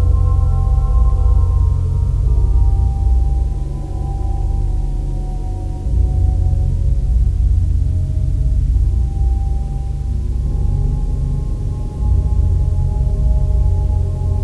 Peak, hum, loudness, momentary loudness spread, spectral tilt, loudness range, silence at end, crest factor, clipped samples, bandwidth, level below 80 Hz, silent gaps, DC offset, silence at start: -4 dBFS; none; -18 LUFS; 7 LU; -9.5 dB/octave; 4 LU; 0 s; 12 dB; under 0.1%; 1.6 kHz; -16 dBFS; none; 0.4%; 0 s